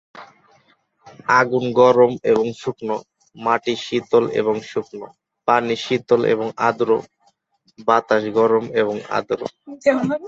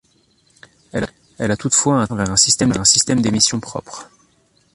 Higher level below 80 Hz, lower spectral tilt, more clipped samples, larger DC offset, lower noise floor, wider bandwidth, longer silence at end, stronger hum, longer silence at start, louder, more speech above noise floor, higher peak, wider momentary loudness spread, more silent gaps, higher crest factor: second, -62 dBFS vs -46 dBFS; first, -5.5 dB/octave vs -3 dB/octave; neither; neither; first, -62 dBFS vs -58 dBFS; second, 7.8 kHz vs 11.5 kHz; second, 0 s vs 0.7 s; neither; second, 0.15 s vs 0.95 s; second, -19 LUFS vs -15 LUFS; about the same, 44 dB vs 41 dB; about the same, 0 dBFS vs 0 dBFS; second, 11 LU vs 17 LU; neither; about the same, 18 dB vs 18 dB